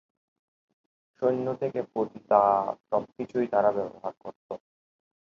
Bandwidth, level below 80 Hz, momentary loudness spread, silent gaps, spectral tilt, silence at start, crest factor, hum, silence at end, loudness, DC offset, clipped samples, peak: 7 kHz; -72 dBFS; 18 LU; 4.17-4.21 s, 4.36-4.49 s; -8.5 dB/octave; 1.2 s; 24 dB; none; 0.65 s; -27 LUFS; under 0.1%; under 0.1%; -6 dBFS